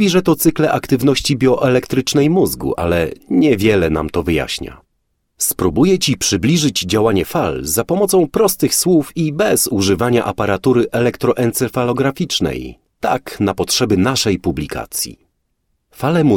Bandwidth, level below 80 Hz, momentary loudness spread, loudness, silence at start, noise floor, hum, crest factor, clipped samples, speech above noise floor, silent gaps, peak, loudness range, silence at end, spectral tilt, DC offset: 17.5 kHz; -38 dBFS; 7 LU; -16 LUFS; 0 s; -68 dBFS; none; 14 dB; under 0.1%; 52 dB; none; -2 dBFS; 3 LU; 0 s; -4.5 dB/octave; under 0.1%